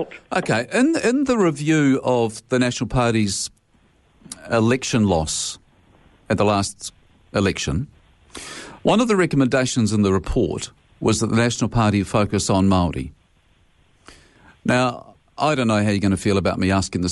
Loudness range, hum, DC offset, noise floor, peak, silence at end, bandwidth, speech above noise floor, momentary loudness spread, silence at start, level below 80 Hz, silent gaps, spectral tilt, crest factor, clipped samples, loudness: 4 LU; none; under 0.1%; -58 dBFS; -6 dBFS; 0 s; 11.5 kHz; 39 dB; 13 LU; 0 s; -42 dBFS; none; -5 dB/octave; 14 dB; under 0.1%; -20 LUFS